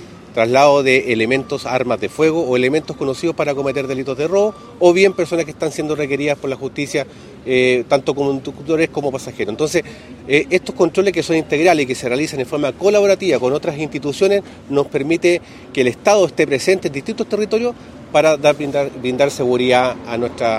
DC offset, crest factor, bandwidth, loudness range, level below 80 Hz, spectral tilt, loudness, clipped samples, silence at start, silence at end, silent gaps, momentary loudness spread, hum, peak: under 0.1%; 16 dB; 14.5 kHz; 3 LU; -50 dBFS; -5 dB/octave; -17 LUFS; under 0.1%; 0 s; 0 s; none; 9 LU; none; 0 dBFS